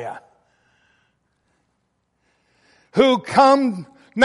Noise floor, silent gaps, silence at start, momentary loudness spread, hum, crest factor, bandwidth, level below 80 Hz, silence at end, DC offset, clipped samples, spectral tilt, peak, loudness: -70 dBFS; none; 0 s; 20 LU; none; 18 dB; 11.5 kHz; -62 dBFS; 0 s; under 0.1%; under 0.1%; -5 dB/octave; -2 dBFS; -17 LUFS